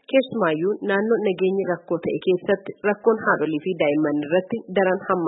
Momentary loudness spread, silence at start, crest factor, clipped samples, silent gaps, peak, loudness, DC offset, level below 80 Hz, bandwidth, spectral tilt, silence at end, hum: 5 LU; 0.1 s; 16 dB; under 0.1%; none; -6 dBFS; -22 LUFS; under 0.1%; -68 dBFS; 4 kHz; -11 dB/octave; 0 s; none